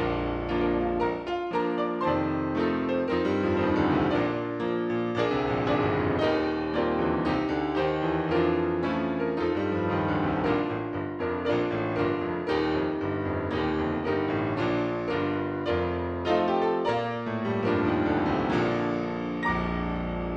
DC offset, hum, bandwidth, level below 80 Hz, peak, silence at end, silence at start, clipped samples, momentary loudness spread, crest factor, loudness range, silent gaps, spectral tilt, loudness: under 0.1%; none; 7.4 kHz; -46 dBFS; -12 dBFS; 0 s; 0 s; under 0.1%; 4 LU; 16 dB; 2 LU; none; -8 dB/octave; -27 LUFS